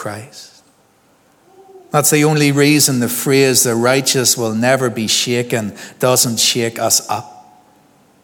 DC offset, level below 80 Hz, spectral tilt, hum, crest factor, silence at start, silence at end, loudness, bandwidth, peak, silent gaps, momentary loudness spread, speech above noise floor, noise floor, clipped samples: under 0.1%; -64 dBFS; -3 dB/octave; none; 16 dB; 0 s; 0.85 s; -13 LUFS; 19.5 kHz; 0 dBFS; none; 9 LU; 39 dB; -54 dBFS; under 0.1%